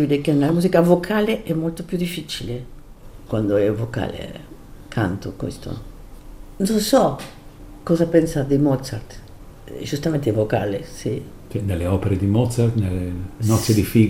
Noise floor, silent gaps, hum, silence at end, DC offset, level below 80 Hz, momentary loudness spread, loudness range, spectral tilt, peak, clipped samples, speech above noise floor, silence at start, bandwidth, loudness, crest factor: -39 dBFS; none; none; 0 s; under 0.1%; -42 dBFS; 16 LU; 5 LU; -6.5 dB/octave; -2 dBFS; under 0.1%; 20 dB; 0 s; 16 kHz; -21 LUFS; 18 dB